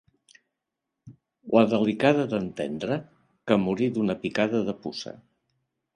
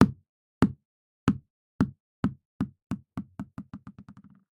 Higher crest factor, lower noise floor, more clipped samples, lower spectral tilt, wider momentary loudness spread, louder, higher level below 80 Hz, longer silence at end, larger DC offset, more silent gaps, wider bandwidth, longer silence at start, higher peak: second, 22 dB vs 30 dB; first, -84 dBFS vs -53 dBFS; neither; about the same, -7 dB/octave vs -8 dB/octave; second, 13 LU vs 21 LU; first, -25 LUFS vs -32 LUFS; second, -64 dBFS vs -52 dBFS; first, 0.8 s vs 0.4 s; neither; second, none vs 0.29-0.61 s, 0.85-1.27 s, 1.50-1.79 s, 2.00-2.23 s, 2.45-2.59 s, 2.82-2.90 s; about the same, 10 kHz vs 11 kHz; first, 1.05 s vs 0 s; second, -6 dBFS vs 0 dBFS